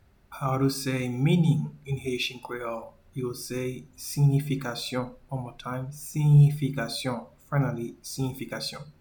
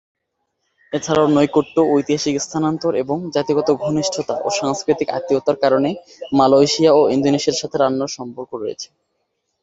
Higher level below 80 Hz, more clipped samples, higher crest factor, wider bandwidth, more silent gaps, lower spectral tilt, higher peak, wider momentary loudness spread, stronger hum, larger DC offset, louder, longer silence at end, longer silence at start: about the same, -56 dBFS vs -56 dBFS; neither; about the same, 18 dB vs 16 dB; first, 19 kHz vs 8 kHz; neither; about the same, -6 dB/octave vs -5 dB/octave; second, -10 dBFS vs -2 dBFS; about the same, 13 LU vs 14 LU; neither; neither; second, -28 LUFS vs -18 LUFS; second, 0.1 s vs 0.8 s; second, 0.3 s vs 0.9 s